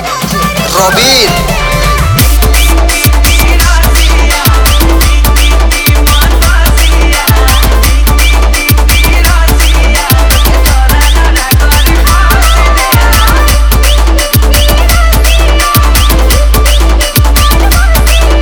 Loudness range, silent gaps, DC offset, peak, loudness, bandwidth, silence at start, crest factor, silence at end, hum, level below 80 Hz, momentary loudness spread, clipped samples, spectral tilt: 0 LU; none; under 0.1%; 0 dBFS; -7 LUFS; over 20 kHz; 0 s; 4 dB; 0 s; none; -6 dBFS; 2 LU; 0.8%; -3.5 dB/octave